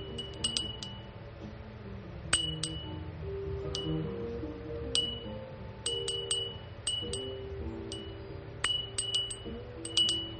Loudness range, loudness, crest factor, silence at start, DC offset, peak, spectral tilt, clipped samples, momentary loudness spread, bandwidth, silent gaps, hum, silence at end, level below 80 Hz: 2 LU; -34 LUFS; 28 dB; 0 s; under 0.1%; -8 dBFS; -2.5 dB/octave; under 0.1%; 15 LU; 8.8 kHz; none; none; 0 s; -50 dBFS